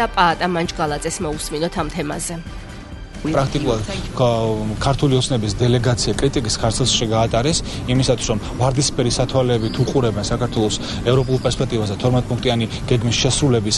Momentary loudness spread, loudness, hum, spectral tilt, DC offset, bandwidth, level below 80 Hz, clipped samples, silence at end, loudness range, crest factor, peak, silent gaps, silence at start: 7 LU; -19 LUFS; none; -5 dB/octave; under 0.1%; 11.5 kHz; -32 dBFS; under 0.1%; 0 s; 4 LU; 18 dB; 0 dBFS; none; 0 s